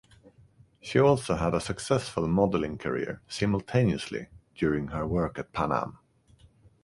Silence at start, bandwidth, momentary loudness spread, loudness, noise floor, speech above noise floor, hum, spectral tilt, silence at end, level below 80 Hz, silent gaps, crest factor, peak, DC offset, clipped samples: 0.25 s; 11.5 kHz; 11 LU; -28 LUFS; -59 dBFS; 32 dB; none; -6.5 dB/octave; 0.9 s; -48 dBFS; none; 20 dB; -8 dBFS; under 0.1%; under 0.1%